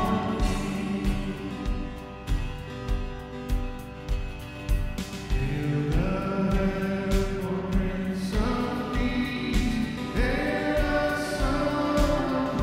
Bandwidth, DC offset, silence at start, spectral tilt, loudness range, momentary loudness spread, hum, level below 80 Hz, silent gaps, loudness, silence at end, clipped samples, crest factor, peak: 16 kHz; under 0.1%; 0 s; -6.5 dB/octave; 7 LU; 9 LU; none; -32 dBFS; none; -28 LUFS; 0 s; under 0.1%; 16 dB; -10 dBFS